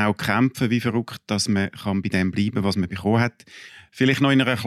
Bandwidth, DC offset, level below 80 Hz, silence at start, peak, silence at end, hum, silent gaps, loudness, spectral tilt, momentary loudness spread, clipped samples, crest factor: 14.5 kHz; under 0.1%; -56 dBFS; 0 s; -6 dBFS; 0 s; none; none; -22 LUFS; -5.5 dB/octave; 9 LU; under 0.1%; 16 dB